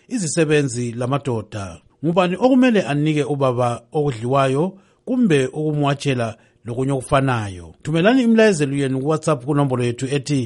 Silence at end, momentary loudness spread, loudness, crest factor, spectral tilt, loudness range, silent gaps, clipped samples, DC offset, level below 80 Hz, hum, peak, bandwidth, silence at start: 0 s; 11 LU; -19 LUFS; 16 dB; -6 dB/octave; 2 LU; none; under 0.1%; under 0.1%; -52 dBFS; none; -2 dBFS; 11.5 kHz; 0.1 s